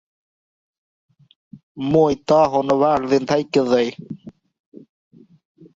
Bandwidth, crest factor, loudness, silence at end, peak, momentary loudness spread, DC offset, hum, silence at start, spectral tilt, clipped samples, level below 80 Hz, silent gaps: 7.8 kHz; 18 dB; -18 LUFS; 1.45 s; -4 dBFS; 15 LU; under 0.1%; none; 1.55 s; -6.5 dB/octave; under 0.1%; -56 dBFS; 1.63-1.75 s